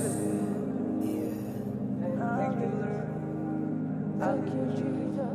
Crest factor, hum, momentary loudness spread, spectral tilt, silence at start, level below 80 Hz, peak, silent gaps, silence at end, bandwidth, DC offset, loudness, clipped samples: 16 dB; none; 4 LU; -7.5 dB/octave; 0 s; -64 dBFS; -16 dBFS; none; 0 s; 14 kHz; under 0.1%; -32 LUFS; under 0.1%